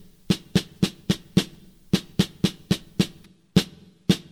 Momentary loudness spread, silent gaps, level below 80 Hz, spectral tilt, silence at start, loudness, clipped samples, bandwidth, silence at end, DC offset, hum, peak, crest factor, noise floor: 4 LU; none; -48 dBFS; -5.5 dB/octave; 0.3 s; -26 LUFS; under 0.1%; 16 kHz; 0.15 s; under 0.1%; none; -4 dBFS; 20 dB; -49 dBFS